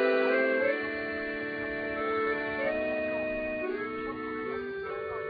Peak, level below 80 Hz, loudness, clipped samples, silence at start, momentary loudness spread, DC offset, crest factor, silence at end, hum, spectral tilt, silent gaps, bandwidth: -14 dBFS; -58 dBFS; -31 LUFS; under 0.1%; 0 s; 9 LU; under 0.1%; 16 dB; 0 s; none; -7.5 dB/octave; none; 5 kHz